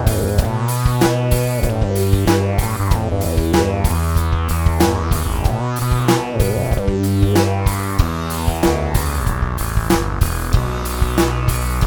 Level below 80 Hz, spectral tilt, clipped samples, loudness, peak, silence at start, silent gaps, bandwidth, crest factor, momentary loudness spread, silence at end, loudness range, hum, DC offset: -22 dBFS; -6 dB/octave; under 0.1%; -18 LUFS; 0 dBFS; 0 s; none; over 20 kHz; 16 dB; 4 LU; 0 s; 2 LU; none; under 0.1%